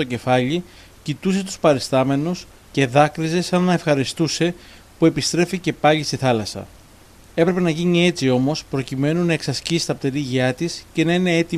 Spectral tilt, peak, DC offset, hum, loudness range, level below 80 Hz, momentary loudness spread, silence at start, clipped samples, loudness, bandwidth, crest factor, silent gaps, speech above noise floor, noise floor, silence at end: -5.5 dB/octave; -2 dBFS; under 0.1%; none; 1 LU; -50 dBFS; 9 LU; 0 s; under 0.1%; -20 LUFS; 14.5 kHz; 18 dB; none; 27 dB; -47 dBFS; 0 s